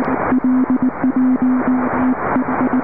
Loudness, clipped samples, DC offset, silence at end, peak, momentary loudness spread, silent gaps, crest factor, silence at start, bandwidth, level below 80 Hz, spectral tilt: -16 LUFS; under 0.1%; 2%; 0 s; -6 dBFS; 2 LU; none; 10 dB; 0 s; 2.9 kHz; -44 dBFS; -12.5 dB/octave